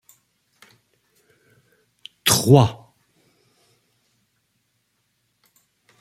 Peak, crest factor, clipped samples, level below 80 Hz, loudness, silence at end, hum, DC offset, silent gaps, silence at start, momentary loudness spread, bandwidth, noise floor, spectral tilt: 0 dBFS; 26 dB; under 0.1%; -58 dBFS; -17 LUFS; 3.3 s; none; under 0.1%; none; 2.25 s; 30 LU; 16 kHz; -70 dBFS; -4.5 dB/octave